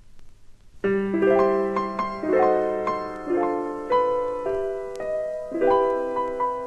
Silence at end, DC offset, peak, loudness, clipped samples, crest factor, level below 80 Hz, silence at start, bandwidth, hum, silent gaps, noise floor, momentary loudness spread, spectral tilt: 0 s; under 0.1%; -8 dBFS; -24 LUFS; under 0.1%; 16 dB; -52 dBFS; 0 s; 9.2 kHz; none; none; -45 dBFS; 9 LU; -7.5 dB/octave